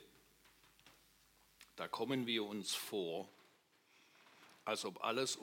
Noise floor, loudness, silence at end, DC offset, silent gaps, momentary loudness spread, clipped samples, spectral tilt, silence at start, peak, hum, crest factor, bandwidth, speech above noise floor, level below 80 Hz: -72 dBFS; -41 LUFS; 0 s; under 0.1%; none; 22 LU; under 0.1%; -3 dB/octave; 0 s; -22 dBFS; none; 22 dB; 16.5 kHz; 31 dB; -84 dBFS